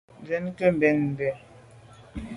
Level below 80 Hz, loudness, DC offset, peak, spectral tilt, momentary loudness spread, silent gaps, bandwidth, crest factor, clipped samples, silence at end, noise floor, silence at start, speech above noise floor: -52 dBFS; -25 LUFS; under 0.1%; -8 dBFS; -8.5 dB/octave; 19 LU; none; 11.5 kHz; 20 dB; under 0.1%; 0 s; -50 dBFS; 0.2 s; 26 dB